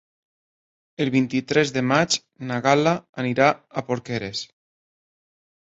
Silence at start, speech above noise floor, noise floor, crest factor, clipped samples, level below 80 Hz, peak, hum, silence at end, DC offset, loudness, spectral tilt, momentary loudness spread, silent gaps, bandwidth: 1 s; over 68 dB; under -90 dBFS; 22 dB; under 0.1%; -62 dBFS; -2 dBFS; none; 1.2 s; under 0.1%; -22 LUFS; -4.5 dB/octave; 10 LU; 3.09-3.13 s; 8.2 kHz